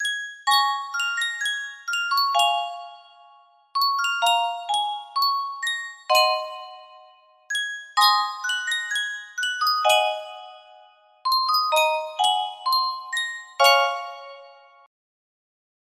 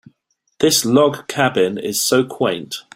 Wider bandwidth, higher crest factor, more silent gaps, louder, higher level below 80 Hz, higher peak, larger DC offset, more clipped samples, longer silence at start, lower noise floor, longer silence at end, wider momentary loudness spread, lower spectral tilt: about the same, 16 kHz vs 16.5 kHz; first, 22 dB vs 16 dB; neither; second, -22 LUFS vs -17 LUFS; second, -80 dBFS vs -58 dBFS; about the same, -4 dBFS vs -2 dBFS; neither; neither; second, 0 s vs 0.6 s; second, -54 dBFS vs -66 dBFS; first, 1.35 s vs 0.15 s; first, 12 LU vs 7 LU; second, 3.5 dB/octave vs -3.5 dB/octave